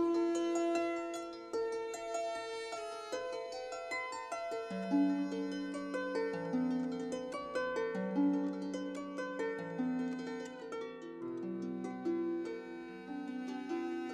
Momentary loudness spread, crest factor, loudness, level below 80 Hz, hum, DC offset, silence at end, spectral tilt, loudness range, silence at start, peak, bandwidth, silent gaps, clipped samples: 10 LU; 16 dB; -38 LUFS; -76 dBFS; none; under 0.1%; 0 s; -5.5 dB/octave; 4 LU; 0 s; -22 dBFS; 12 kHz; none; under 0.1%